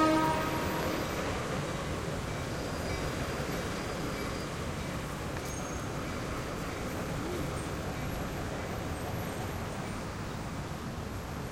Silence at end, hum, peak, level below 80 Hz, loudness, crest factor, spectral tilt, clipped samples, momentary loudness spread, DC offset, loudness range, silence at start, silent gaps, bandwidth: 0 s; none; -16 dBFS; -46 dBFS; -35 LUFS; 18 dB; -5 dB/octave; under 0.1%; 6 LU; under 0.1%; 3 LU; 0 s; none; 16.5 kHz